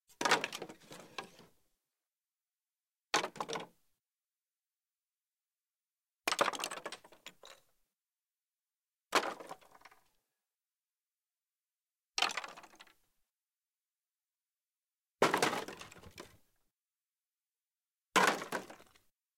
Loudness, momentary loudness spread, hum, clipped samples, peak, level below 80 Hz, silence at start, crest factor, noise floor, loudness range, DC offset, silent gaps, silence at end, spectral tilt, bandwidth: -35 LUFS; 23 LU; none; under 0.1%; -14 dBFS; -80 dBFS; 0.2 s; 28 dB; under -90 dBFS; 5 LU; under 0.1%; none; 0.6 s; -1.5 dB/octave; 16.5 kHz